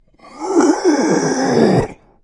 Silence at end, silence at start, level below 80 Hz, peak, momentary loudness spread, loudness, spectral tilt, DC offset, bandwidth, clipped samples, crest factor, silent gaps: 0.3 s; 0.35 s; -44 dBFS; 0 dBFS; 8 LU; -15 LUFS; -5.5 dB/octave; under 0.1%; 11 kHz; under 0.1%; 16 dB; none